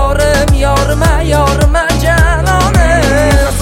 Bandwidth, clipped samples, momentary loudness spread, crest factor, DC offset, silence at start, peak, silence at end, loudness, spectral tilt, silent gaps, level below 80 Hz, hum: 16.5 kHz; under 0.1%; 2 LU; 8 dB; under 0.1%; 0 s; 0 dBFS; 0 s; -10 LUFS; -5 dB/octave; none; -12 dBFS; none